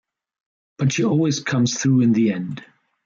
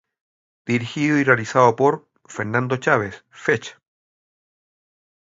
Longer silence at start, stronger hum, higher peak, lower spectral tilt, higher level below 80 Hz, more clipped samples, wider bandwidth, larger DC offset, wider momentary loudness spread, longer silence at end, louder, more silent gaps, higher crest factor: first, 0.8 s vs 0.65 s; neither; second, -8 dBFS vs 0 dBFS; about the same, -5.5 dB/octave vs -6 dB/octave; about the same, -62 dBFS vs -62 dBFS; neither; about the same, 7.6 kHz vs 7.8 kHz; neither; second, 11 LU vs 15 LU; second, 0.45 s vs 1.5 s; about the same, -19 LUFS vs -20 LUFS; neither; second, 12 dB vs 22 dB